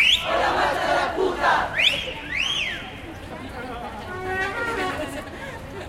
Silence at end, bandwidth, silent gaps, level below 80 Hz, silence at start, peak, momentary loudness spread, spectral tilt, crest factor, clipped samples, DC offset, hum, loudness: 0 s; 16.5 kHz; none; -44 dBFS; 0 s; -6 dBFS; 16 LU; -3 dB/octave; 18 dB; under 0.1%; under 0.1%; none; -23 LUFS